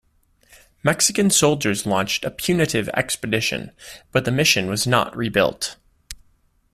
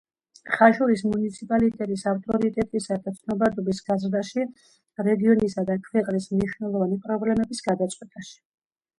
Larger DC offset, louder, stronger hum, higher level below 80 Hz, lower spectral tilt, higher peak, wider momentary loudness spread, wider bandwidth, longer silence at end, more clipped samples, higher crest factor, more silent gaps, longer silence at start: neither; first, -20 LUFS vs -24 LUFS; neither; first, -50 dBFS vs -56 dBFS; second, -3.5 dB/octave vs -6.5 dB/octave; about the same, -2 dBFS vs -4 dBFS; first, 17 LU vs 10 LU; first, 15.5 kHz vs 11 kHz; about the same, 0.6 s vs 0.65 s; neither; about the same, 20 dB vs 22 dB; neither; first, 0.85 s vs 0.45 s